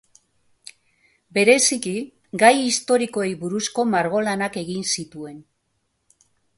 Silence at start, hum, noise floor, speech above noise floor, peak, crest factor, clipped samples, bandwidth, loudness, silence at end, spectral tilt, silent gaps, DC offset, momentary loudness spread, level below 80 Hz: 1.35 s; none; -72 dBFS; 51 dB; 0 dBFS; 22 dB; under 0.1%; 11.5 kHz; -20 LUFS; 1.15 s; -3 dB/octave; none; under 0.1%; 15 LU; -66 dBFS